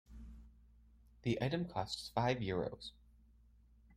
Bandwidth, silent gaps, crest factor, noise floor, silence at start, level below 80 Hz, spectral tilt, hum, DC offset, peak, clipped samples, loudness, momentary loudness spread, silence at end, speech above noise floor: 15.5 kHz; none; 20 dB; -66 dBFS; 0.1 s; -60 dBFS; -6 dB/octave; none; under 0.1%; -20 dBFS; under 0.1%; -39 LUFS; 20 LU; 0 s; 27 dB